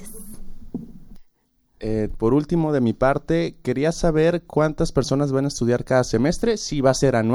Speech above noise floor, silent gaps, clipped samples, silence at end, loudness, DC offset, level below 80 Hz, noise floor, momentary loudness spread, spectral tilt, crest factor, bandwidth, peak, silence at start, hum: 44 dB; none; under 0.1%; 0 s; -21 LUFS; under 0.1%; -36 dBFS; -64 dBFS; 17 LU; -6 dB/octave; 18 dB; 17 kHz; -4 dBFS; 0 s; none